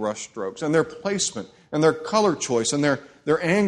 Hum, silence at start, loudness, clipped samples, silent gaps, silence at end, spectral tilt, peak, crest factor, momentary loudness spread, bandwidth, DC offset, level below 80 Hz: none; 0 s; -23 LUFS; under 0.1%; none; 0 s; -4 dB/octave; -6 dBFS; 18 dB; 9 LU; 11.5 kHz; under 0.1%; -62 dBFS